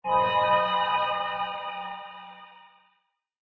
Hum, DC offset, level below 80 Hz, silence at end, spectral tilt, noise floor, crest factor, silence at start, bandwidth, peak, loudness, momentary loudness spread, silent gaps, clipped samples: none; under 0.1%; -64 dBFS; 1 s; -5.5 dB/octave; -73 dBFS; 18 dB; 0.05 s; 6 kHz; -10 dBFS; -26 LUFS; 21 LU; none; under 0.1%